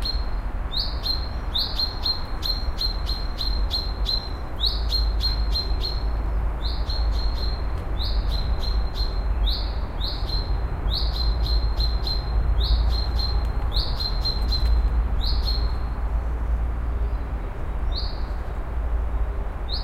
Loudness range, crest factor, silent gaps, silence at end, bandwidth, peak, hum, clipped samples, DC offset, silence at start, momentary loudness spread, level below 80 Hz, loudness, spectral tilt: 3 LU; 14 dB; none; 0 s; 13.5 kHz; -10 dBFS; none; under 0.1%; under 0.1%; 0 s; 6 LU; -24 dBFS; -26 LUFS; -5.5 dB/octave